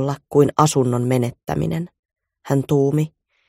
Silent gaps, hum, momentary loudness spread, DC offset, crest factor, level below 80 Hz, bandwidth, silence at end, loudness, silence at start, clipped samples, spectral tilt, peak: 1.99-2.03 s; none; 9 LU; under 0.1%; 18 dB; -50 dBFS; 16 kHz; 0.4 s; -19 LUFS; 0 s; under 0.1%; -6.5 dB/octave; 0 dBFS